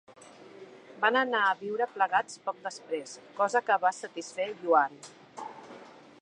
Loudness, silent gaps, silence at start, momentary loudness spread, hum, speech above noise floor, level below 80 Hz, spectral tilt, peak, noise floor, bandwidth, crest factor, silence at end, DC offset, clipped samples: -29 LUFS; none; 0.1 s; 23 LU; none; 21 dB; -86 dBFS; -2.5 dB/octave; -10 dBFS; -50 dBFS; 10.5 kHz; 22 dB; 0.3 s; under 0.1%; under 0.1%